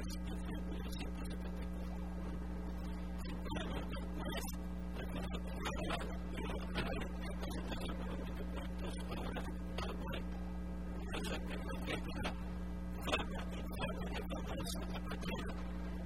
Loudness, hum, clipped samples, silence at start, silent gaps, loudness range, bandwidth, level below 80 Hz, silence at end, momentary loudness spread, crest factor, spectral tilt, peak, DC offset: -43 LUFS; none; under 0.1%; 0 s; none; 2 LU; 16 kHz; -46 dBFS; 0 s; 4 LU; 22 dB; -5.5 dB/octave; -20 dBFS; 0.3%